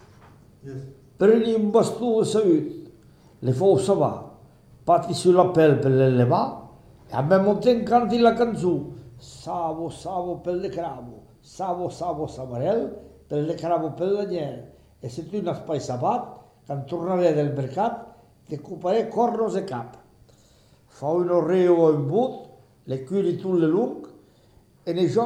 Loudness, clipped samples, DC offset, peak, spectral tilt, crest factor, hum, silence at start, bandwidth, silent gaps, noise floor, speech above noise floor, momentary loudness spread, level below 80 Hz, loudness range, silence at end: -23 LUFS; under 0.1%; under 0.1%; -4 dBFS; -7 dB/octave; 20 dB; none; 0.65 s; 12.5 kHz; none; -56 dBFS; 34 dB; 19 LU; -58 dBFS; 9 LU; 0 s